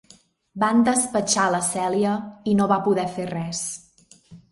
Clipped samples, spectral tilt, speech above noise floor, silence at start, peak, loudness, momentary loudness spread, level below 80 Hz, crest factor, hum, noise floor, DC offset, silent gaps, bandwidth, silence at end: under 0.1%; -4 dB/octave; 33 dB; 0.55 s; -6 dBFS; -22 LUFS; 10 LU; -60 dBFS; 18 dB; none; -55 dBFS; under 0.1%; none; 11.5 kHz; 0.15 s